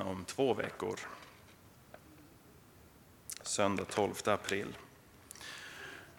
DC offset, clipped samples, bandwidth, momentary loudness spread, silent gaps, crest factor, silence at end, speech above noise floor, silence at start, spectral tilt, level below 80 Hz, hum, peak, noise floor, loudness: under 0.1%; under 0.1%; 19 kHz; 24 LU; none; 24 dB; 0 s; 25 dB; 0 s; -3.5 dB/octave; -70 dBFS; none; -14 dBFS; -60 dBFS; -37 LUFS